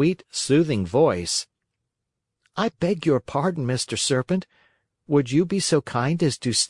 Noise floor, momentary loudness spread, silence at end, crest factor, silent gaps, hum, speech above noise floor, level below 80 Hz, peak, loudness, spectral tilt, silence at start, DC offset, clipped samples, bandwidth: -82 dBFS; 7 LU; 0.05 s; 16 dB; none; none; 60 dB; -58 dBFS; -6 dBFS; -23 LUFS; -4.5 dB/octave; 0 s; under 0.1%; under 0.1%; 11.5 kHz